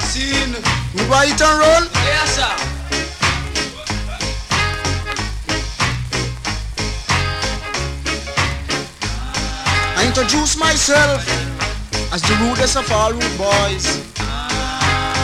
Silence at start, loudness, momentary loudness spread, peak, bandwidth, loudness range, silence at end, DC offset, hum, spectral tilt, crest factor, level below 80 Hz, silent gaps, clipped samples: 0 s; -17 LUFS; 10 LU; -2 dBFS; 15 kHz; 5 LU; 0 s; under 0.1%; none; -3 dB/octave; 16 dB; -28 dBFS; none; under 0.1%